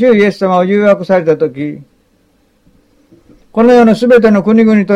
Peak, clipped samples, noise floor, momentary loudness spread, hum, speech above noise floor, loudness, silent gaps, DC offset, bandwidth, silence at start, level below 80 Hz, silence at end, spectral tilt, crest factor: 0 dBFS; under 0.1%; -53 dBFS; 10 LU; none; 45 dB; -9 LUFS; none; under 0.1%; 10 kHz; 0 s; -48 dBFS; 0 s; -7.5 dB/octave; 10 dB